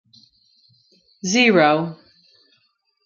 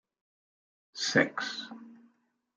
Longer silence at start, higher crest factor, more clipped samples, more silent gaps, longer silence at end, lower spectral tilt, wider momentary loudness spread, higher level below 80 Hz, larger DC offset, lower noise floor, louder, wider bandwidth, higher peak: first, 1.25 s vs 0.95 s; second, 20 dB vs 26 dB; neither; neither; first, 1.1 s vs 0.6 s; about the same, -4 dB/octave vs -3 dB/octave; second, 16 LU vs 21 LU; first, -70 dBFS vs -84 dBFS; neither; second, -66 dBFS vs -71 dBFS; first, -17 LUFS vs -30 LUFS; second, 7.4 kHz vs 9.4 kHz; first, -2 dBFS vs -10 dBFS